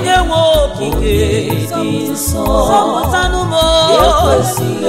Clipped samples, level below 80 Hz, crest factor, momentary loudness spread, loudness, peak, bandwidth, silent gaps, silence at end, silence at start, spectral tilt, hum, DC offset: under 0.1%; -22 dBFS; 12 dB; 7 LU; -12 LUFS; 0 dBFS; 16.5 kHz; none; 0 s; 0 s; -4.5 dB/octave; none; under 0.1%